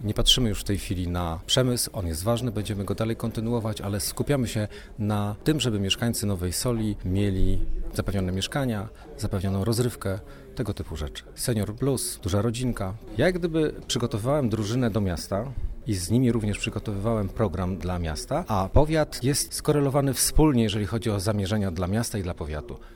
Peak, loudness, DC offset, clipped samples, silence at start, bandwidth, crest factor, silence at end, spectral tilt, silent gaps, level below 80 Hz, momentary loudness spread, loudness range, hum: -6 dBFS; -26 LUFS; under 0.1%; under 0.1%; 0 s; over 20 kHz; 20 dB; 0 s; -5 dB/octave; none; -36 dBFS; 10 LU; 5 LU; none